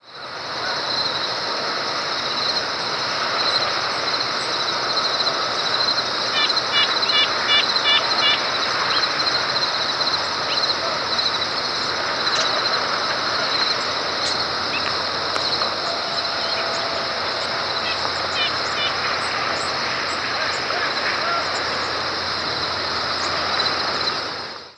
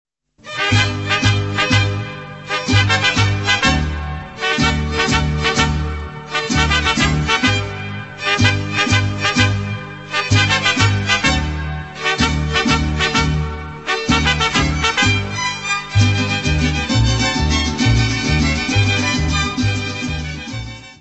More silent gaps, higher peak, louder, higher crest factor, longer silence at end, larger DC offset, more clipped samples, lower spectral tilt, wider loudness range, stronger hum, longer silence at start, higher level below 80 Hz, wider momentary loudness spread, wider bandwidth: neither; second, -4 dBFS vs 0 dBFS; second, -20 LUFS vs -16 LUFS; about the same, 18 dB vs 18 dB; about the same, 0.05 s vs 0.05 s; neither; neither; second, -1.5 dB/octave vs -4 dB/octave; first, 4 LU vs 1 LU; neither; second, 0.05 s vs 0.45 s; second, -58 dBFS vs -28 dBFS; second, 6 LU vs 11 LU; first, 11 kHz vs 8.4 kHz